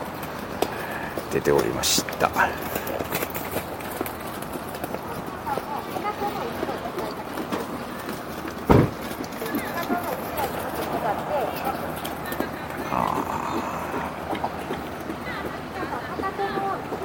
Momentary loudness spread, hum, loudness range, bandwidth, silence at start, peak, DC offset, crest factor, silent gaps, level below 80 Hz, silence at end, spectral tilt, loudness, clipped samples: 10 LU; none; 6 LU; 17 kHz; 0 s; -2 dBFS; under 0.1%; 26 dB; none; -46 dBFS; 0 s; -4.5 dB/octave; -27 LUFS; under 0.1%